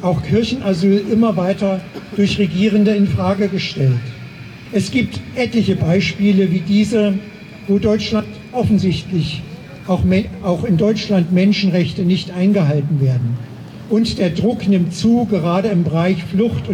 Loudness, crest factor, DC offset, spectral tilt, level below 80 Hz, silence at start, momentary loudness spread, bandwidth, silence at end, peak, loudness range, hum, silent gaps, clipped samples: -16 LUFS; 12 dB; under 0.1%; -7 dB/octave; -42 dBFS; 0 s; 9 LU; 10.5 kHz; 0 s; -4 dBFS; 2 LU; none; none; under 0.1%